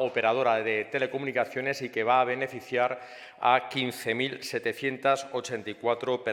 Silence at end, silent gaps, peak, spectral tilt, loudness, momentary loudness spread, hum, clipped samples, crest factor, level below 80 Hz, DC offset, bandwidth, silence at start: 0 s; none; -8 dBFS; -4 dB/octave; -28 LUFS; 7 LU; none; under 0.1%; 22 dB; -80 dBFS; under 0.1%; 17 kHz; 0 s